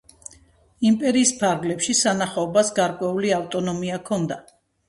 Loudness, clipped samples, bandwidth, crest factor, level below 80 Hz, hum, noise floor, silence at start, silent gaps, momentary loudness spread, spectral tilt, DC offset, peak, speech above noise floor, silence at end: -21 LUFS; under 0.1%; 11.5 kHz; 18 dB; -60 dBFS; none; -54 dBFS; 0.8 s; none; 11 LU; -4 dB/octave; under 0.1%; -4 dBFS; 33 dB; 0.5 s